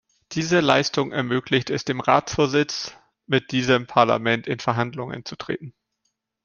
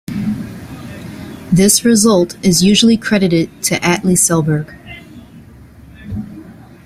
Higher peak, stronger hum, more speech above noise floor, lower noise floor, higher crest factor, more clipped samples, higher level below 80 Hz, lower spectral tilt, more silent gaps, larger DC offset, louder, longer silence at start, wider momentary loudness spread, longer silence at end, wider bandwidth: about the same, -2 dBFS vs 0 dBFS; neither; first, 54 dB vs 27 dB; first, -76 dBFS vs -39 dBFS; first, 22 dB vs 14 dB; neither; second, -56 dBFS vs -42 dBFS; about the same, -5 dB/octave vs -4 dB/octave; neither; neither; second, -22 LUFS vs -12 LUFS; first, 0.3 s vs 0.1 s; second, 13 LU vs 21 LU; first, 0.75 s vs 0.35 s; second, 7.6 kHz vs 16 kHz